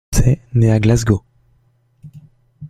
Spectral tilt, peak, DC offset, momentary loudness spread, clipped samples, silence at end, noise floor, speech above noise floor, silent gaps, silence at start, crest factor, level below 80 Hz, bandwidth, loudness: -6.5 dB/octave; 0 dBFS; under 0.1%; 5 LU; under 0.1%; 0 s; -58 dBFS; 44 dB; none; 0.1 s; 16 dB; -28 dBFS; 14 kHz; -15 LUFS